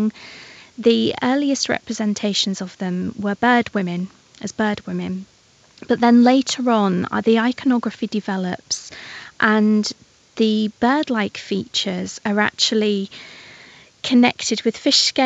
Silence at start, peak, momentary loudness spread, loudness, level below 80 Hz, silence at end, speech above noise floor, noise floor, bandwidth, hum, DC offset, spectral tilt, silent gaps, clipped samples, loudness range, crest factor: 0 s; -2 dBFS; 17 LU; -19 LUFS; -62 dBFS; 0 s; 33 dB; -52 dBFS; 8.4 kHz; none; under 0.1%; -4 dB/octave; none; under 0.1%; 4 LU; 18 dB